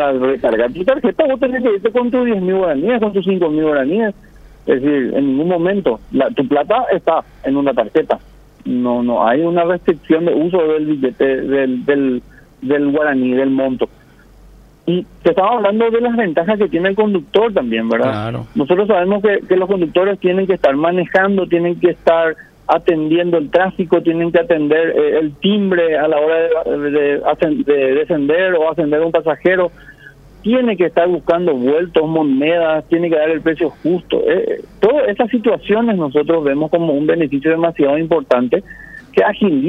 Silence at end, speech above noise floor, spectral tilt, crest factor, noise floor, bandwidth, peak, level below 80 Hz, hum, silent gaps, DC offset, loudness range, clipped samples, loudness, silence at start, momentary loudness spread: 0 s; 29 dB; -8.5 dB/octave; 14 dB; -43 dBFS; 5.6 kHz; 0 dBFS; -48 dBFS; none; none; under 0.1%; 2 LU; under 0.1%; -15 LUFS; 0 s; 4 LU